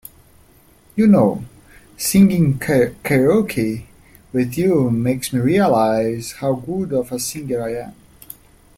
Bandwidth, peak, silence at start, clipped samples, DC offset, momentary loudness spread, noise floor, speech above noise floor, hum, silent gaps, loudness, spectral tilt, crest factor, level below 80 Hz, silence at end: 16.5 kHz; -2 dBFS; 0.95 s; under 0.1%; under 0.1%; 16 LU; -51 dBFS; 34 dB; none; none; -18 LUFS; -6 dB/octave; 16 dB; -48 dBFS; 0.85 s